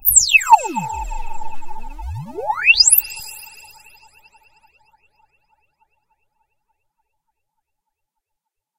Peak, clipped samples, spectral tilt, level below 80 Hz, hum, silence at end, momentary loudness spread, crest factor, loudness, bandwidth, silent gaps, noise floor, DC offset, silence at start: 0 dBFS; under 0.1%; 0.5 dB/octave; -38 dBFS; none; 5.15 s; 25 LU; 20 dB; -13 LUFS; 16 kHz; none; -81 dBFS; under 0.1%; 0.05 s